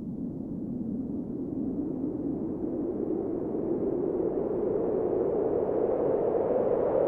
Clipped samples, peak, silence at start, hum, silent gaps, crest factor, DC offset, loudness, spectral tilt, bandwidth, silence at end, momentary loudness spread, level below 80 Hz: under 0.1%; -14 dBFS; 0 s; none; none; 16 dB; under 0.1%; -30 LUFS; -12 dB/octave; 3.2 kHz; 0 s; 7 LU; -54 dBFS